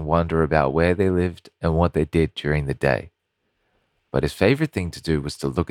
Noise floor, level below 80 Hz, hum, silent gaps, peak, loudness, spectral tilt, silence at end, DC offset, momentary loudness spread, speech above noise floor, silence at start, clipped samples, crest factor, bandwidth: -74 dBFS; -36 dBFS; none; none; -2 dBFS; -22 LUFS; -7 dB/octave; 0.05 s; under 0.1%; 7 LU; 53 dB; 0 s; under 0.1%; 20 dB; 15 kHz